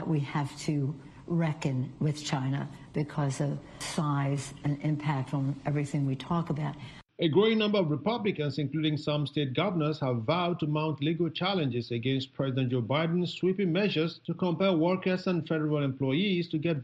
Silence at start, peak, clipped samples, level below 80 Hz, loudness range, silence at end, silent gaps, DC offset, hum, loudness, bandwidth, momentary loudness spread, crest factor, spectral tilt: 0 s; -12 dBFS; under 0.1%; -64 dBFS; 3 LU; 0 s; none; under 0.1%; none; -30 LUFS; 11.5 kHz; 6 LU; 16 dB; -6.5 dB/octave